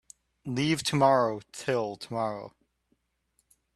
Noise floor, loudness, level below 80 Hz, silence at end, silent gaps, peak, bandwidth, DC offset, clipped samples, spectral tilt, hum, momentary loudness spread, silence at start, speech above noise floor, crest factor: -74 dBFS; -28 LUFS; -66 dBFS; 1.25 s; none; -10 dBFS; 13 kHz; under 0.1%; under 0.1%; -5 dB/octave; none; 17 LU; 0.45 s; 47 dB; 20 dB